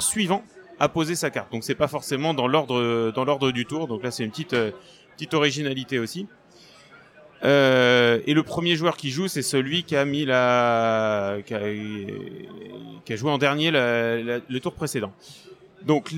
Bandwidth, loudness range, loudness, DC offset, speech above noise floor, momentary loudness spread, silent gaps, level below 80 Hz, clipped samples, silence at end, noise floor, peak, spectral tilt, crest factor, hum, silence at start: 17 kHz; 5 LU; -23 LUFS; under 0.1%; 28 dB; 14 LU; none; -62 dBFS; under 0.1%; 0 s; -51 dBFS; -6 dBFS; -4.5 dB/octave; 18 dB; none; 0 s